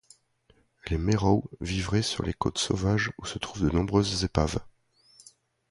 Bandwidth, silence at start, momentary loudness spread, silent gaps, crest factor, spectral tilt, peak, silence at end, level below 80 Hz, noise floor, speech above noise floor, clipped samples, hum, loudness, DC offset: 11.5 kHz; 0.85 s; 9 LU; none; 22 dB; -5 dB/octave; -6 dBFS; 1 s; -40 dBFS; -65 dBFS; 38 dB; under 0.1%; none; -28 LUFS; under 0.1%